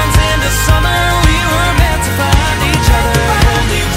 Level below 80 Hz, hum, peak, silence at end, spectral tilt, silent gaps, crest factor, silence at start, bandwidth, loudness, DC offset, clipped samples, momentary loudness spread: -14 dBFS; none; 0 dBFS; 0 s; -4 dB/octave; none; 10 dB; 0 s; 16.5 kHz; -11 LUFS; under 0.1%; under 0.1%; 2 LU